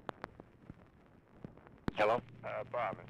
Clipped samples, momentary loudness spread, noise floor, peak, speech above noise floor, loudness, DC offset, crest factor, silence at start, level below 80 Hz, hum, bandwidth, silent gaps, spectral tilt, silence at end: under 0.1%; 24 LU; -63 dBFS; -22 dBFS; 27 dB; -37 LUFS; under 0.1%; 18 dB; 0.2 s; -62 dBFS; none; 11.5 kHz; none; -6.5 dB/octave; 0 s